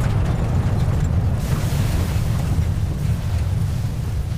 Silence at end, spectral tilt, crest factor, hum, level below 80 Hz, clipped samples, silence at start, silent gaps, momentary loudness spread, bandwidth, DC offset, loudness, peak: 0 s; -7 dB/octave; 12 dB; none; -26 dBFS; under 0.1%; 0 s; none; 3 LU; 16 kHz; under 0.1%; -21 LUFS; -8 dBFS